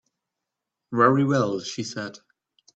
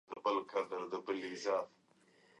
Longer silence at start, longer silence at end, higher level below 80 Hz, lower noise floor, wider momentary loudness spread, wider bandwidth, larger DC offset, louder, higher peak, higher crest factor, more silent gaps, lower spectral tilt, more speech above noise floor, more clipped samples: first, 0.9 s vs 0.1 s; about the same, 0.65 s vs 0.75 s; first, -66 dBFS vs -88 dBFS; first, -85 dBFS vs -69 dBFS; first, 15 LU vs 5 LU; second, 8.2 kHz vs 11 kHz; neither; first, -23 LUFS vs -39 LUFS; first, -4 dBFS vs -22 dBFS; about the same, 22 dB vs 18 dB; neither; first, -6 dB/octave vs -3.5 dB/octave; first, 62 dB vs 30 dB; neither